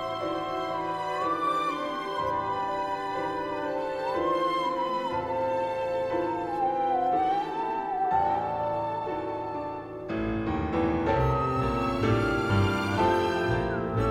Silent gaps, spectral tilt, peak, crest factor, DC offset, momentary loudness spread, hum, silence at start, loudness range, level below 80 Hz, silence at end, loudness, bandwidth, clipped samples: none; -7 dB/octave; -12 dBFS; 16 dB; under 0.1%; 6 LU; none; 0 s; 3 LU; -46 dBFS; 0 s; -28 LUFS; 15.5 kHz; under 0.1%